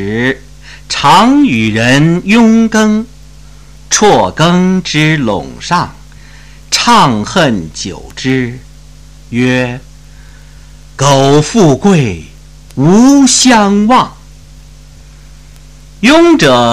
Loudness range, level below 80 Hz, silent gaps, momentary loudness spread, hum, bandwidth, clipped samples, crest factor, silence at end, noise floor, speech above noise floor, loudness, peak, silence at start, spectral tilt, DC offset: 6 LU; -36 dBFS; none; 14 LU; none; 14 kHz; under 0.1%; 10 dB; 0 s; -35 dBFS; 27 dB; -9 LUFS; 0 dBFS; 0 s; -4.5 dB/octave; under 0.1%